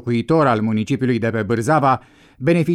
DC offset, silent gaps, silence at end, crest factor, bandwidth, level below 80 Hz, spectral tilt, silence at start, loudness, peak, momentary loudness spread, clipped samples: under 0.1%; none; 0 s; 12 dB; 13 kHz; -54 dBFS; -7.5 dB/octave; 0.05 s; -18 LUFS; -6 dBFS; 4 LU; under 0.1%